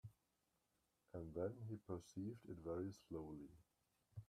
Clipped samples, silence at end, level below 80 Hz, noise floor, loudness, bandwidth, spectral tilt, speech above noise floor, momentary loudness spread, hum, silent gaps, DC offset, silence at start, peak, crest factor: under 0.1%; 0.05 s; -74 dBFS; -87 dBFS; -52 LUFS; 14.5 kHz; -8 dB/octave; 36 dB; 11 LU; none; none; under 0.1%; 0.05 s; -34 dBFS; 20 dB